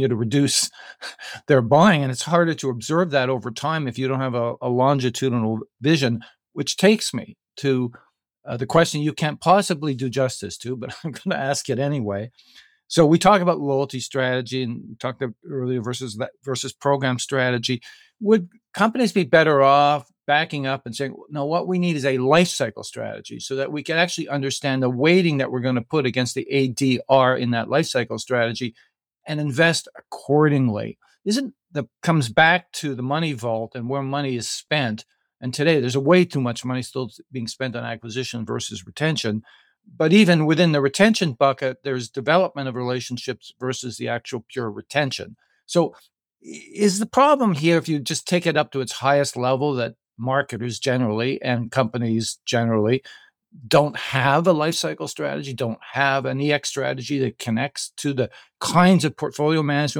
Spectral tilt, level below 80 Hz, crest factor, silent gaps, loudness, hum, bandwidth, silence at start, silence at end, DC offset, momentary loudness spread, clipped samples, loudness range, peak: -5 dB/octave; -62 dBFS; 18 dB; none; -21 LUFS; none; 17.5 kHz; 0 s; 0 s; under 0.1%; 13 LU; under 0.1%; 5 LU; -4 dBFS